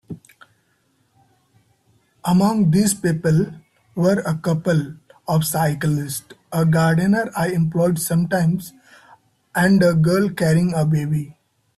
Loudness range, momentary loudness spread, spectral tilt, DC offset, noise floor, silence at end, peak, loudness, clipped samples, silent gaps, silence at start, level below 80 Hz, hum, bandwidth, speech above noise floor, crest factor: 2 LU; 12 LU; -6.5 dB/octave; under 0.1%; -64 dBFS; 0.45 s; -6 dBFS; -19 LUFS; under 0.1%; none; 0.1 s; -52 dBFS; none; 14 kHz; 46 dB; 14 dB